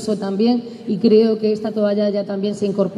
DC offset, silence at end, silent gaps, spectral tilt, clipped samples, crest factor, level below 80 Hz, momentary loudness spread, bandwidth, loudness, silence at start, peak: under 0.1%; 0 s; none; -7 dB/octave; under 0.1%; 14 dB; -66 dBFS; 8 LU; 11 kHz; -18 LUFS; 0 s; -4 dBFS